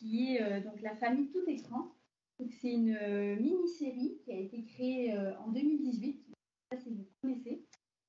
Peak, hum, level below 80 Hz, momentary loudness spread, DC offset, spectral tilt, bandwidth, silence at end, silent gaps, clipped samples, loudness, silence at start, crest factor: -22 dBFS; none; -88 dBFS; 13 LU; under 0.1%; -5.5 dB/octave; 7.4 kHz; 0.45 s; none; under 0.1%; -37 LUFS; 0 s; 14 dB